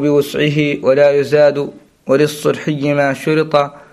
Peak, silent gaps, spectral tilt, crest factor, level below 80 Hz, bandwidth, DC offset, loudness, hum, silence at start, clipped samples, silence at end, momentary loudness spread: 0 dBFS; none; -6 dB/octave; 14 dB; -54 dBFS; 14.5 kHz; under 0.1%; -14 LUFS; none; 0 s; under 0.1%; 0.15 s; 6 LU